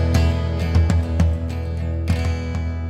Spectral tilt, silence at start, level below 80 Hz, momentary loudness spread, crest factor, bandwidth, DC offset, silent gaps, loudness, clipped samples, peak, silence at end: -7 dB/octave; 0 s; -28 dBFS; 7 LU; 14 dB; 9.4 kHz; under 0.1%; none; -21 LUFS; under 0.1%; -4 dBFS; 0 s